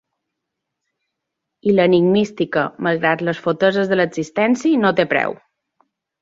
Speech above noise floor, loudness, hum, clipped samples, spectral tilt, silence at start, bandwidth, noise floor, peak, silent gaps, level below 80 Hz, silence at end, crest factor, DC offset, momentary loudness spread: 63 dB; -17 LUFS; none; under 0.1%; -6.5 dB/octave; 1.65 s; 7.8 kHz; -80 dBFS; -2 dBFS; none; -60 dBFS; 0.85 s; 18 dB; under 0.1%; 6 LU